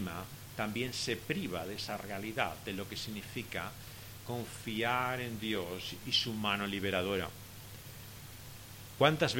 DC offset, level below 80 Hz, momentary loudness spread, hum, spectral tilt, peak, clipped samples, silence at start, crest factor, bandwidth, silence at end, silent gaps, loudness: under 0.1%; -60 dBFS; 17 LU; none; -4 dB/octave; -10 dBFS; under 0.1%; 0 s; 26 dB; 17 kHz; 0 s; none; -36 LUFS